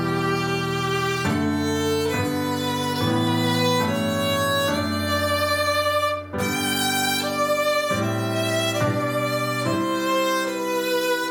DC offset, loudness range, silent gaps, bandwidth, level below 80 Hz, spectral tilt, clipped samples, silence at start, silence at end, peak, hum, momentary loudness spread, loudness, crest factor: under 0.1%; 1 LU; none; 19 kHz; -54 dBFS; -4.5 dB/octave; under 0.1%; 0 s; 0 s; -10 dBFS; none; 3 LU; -22 LUFS; 14 dB